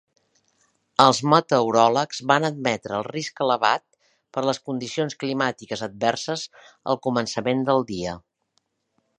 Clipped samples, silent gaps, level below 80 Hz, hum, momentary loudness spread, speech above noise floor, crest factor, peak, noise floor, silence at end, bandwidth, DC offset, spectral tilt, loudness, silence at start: under 0.1%; none; -62 dBFS; none; 13 LU; 50 dB; 24 dB; 0 dBFS; -72 dBFS; 1 s; 11 kHz; under 0.1%; -4.5 dB/octave; -23 LUFS; 1 s